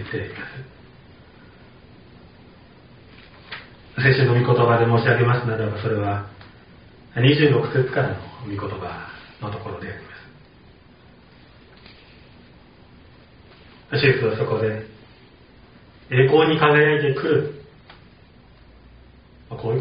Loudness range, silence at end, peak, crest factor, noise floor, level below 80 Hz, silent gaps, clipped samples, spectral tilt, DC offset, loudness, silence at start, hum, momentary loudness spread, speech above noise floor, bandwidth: 17 LU; 0 s; 0 dBFS; 22 dB; -49 dBFS; -54 dBFS; none; under 0.1%; -5 dB/octave; under 0.1%; -20 LUFS; 0 s; none; 22 LU; 30 dB; 5.2 kHz